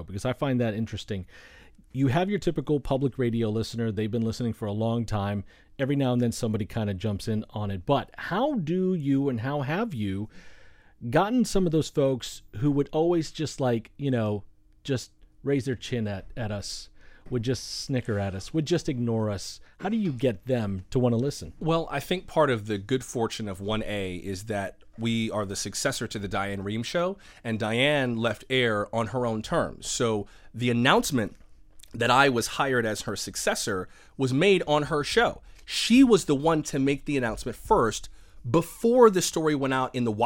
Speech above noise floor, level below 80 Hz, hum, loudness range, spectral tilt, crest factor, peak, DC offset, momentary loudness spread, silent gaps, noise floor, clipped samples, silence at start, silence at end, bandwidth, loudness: 22 dB; -48 dBFS; none; 6 LU; -5.5 dB/octave; 22 dB; -4 dBFS; under 0.1%; 10 LU; none; -49 dBFS; under 0.1%; 0 s; 0 s; 16.5 kHz; -27 LUFS